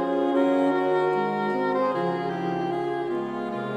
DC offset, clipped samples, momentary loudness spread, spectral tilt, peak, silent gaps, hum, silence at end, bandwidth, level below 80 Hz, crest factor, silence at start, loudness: under 0.1%; under 0.1%; 7 LU; -7.5 dB/octave; -10 dBFS; none; none; 0 s; 9.2 kHz; -64 dBFS; 14 dB; 0 s; -25 LUFS